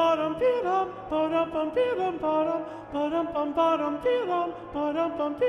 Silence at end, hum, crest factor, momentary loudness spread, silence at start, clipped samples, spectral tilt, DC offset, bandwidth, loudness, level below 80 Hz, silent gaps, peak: 0 s; none; 14 dB; 5 LU; 0 s; under 0.1%; -6.5 dB/octave; under 0.1%; 9 kHz; -27 LUFS; -58 dBFS; none; -12 dBFS